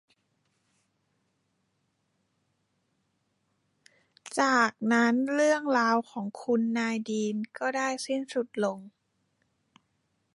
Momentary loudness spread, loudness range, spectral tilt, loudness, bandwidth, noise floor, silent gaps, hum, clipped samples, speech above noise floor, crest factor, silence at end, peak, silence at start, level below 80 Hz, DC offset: 9 LU; 7 LU; -4 dB/octave; -28 LUFS; 11.5 kHz; -76 dBFS; none; none; under 0.1%; 49 dB; 20 dB; 1.45 s; -10 dBFS; 4.25 s; -82 dBFS; under 0.1%